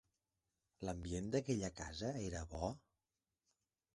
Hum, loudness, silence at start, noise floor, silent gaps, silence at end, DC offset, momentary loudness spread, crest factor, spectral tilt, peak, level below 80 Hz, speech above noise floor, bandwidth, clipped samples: none; -44 LUFS; 0.8 s; under -90 dBFS; none; 1.15 s; under 0.1%; 8 LU; 20 dB; -5.5 dB/octave; -24 dBFS; -58 dBFS; over 47 dB; 11.5 kHz; under 0.1%